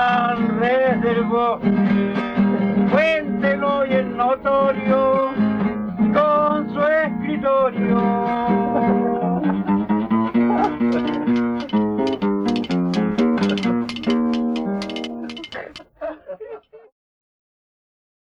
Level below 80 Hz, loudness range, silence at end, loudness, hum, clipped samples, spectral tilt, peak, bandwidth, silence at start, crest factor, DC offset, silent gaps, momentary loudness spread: -50 dBFS; 7 LU; 1.6 s; -19 LUFS; none; under 0.1%; -7.5 dB/octave; -6 dBFS; 7.4 kHz; 0 s; 14 dB; under 0.1%; none; 10 LU